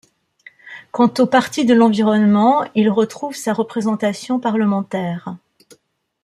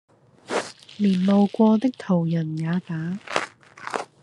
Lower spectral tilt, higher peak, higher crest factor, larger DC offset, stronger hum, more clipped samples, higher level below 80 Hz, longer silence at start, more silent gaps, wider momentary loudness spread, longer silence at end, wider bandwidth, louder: about the same, -6 dB/octave vs -7 dB/octave; about the same, -2 dBFS vs -2 dBFS; second, 16 dB vs 22 dB; neither; neither; neither; about the same, -64 dBFS vs -68 dBFS; first, 0.65 s vs 0.5 s; neither; first, 16 LU vs 13 LU; first, 0.85 s vs 0.2 s; first, 13 kHz vs 11 kHz; first, -17 LUFS vs -23 LUFS